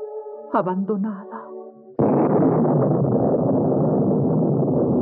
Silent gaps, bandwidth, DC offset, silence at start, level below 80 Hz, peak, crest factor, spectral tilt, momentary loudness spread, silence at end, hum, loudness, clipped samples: none; 3.1 kHz; under 0.1%; 0 s; -60 dBFS; -6 dBFS; 14 dB; -12 dB/octave; 16 LU; 0 s; none; -20 LUFS; under 0.1%